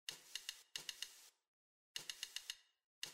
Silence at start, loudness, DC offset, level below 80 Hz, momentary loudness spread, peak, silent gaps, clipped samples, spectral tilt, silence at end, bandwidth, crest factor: 0.1 s; -50 LUFS; under 0.1%; under -90 dBFS; 7 LU; -28 dBFS; 1.48-1.95 s, 2.84-3.02 s; under 0.1%; 2 dB/octave; 0 s; 16 kHz; 24 dB